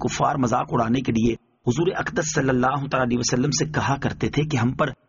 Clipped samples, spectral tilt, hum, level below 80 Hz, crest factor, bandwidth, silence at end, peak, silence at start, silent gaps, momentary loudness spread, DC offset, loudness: under 0.1%; -5.5 dB/octave; none; -46 dBFS; 16 dB; 7.4 kHz; 0.15 s; -8 dBFS; 0 s; none; 4 LU; under 0.1%; -23 LUFS